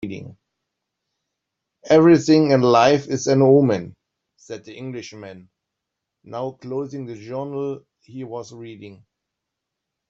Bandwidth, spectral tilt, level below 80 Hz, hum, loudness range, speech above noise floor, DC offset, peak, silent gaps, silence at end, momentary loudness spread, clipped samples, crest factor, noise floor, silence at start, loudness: 7.6 kHz; -6.5 dB/octave; -62 dBFS; none; 16 LU; 63 dB; under 0.1%; -2 dBFS; none; 1.15 s; 23 LU; under 0.1%; 18 dB; -82 dBFS; 0.05 s; -17 LUFS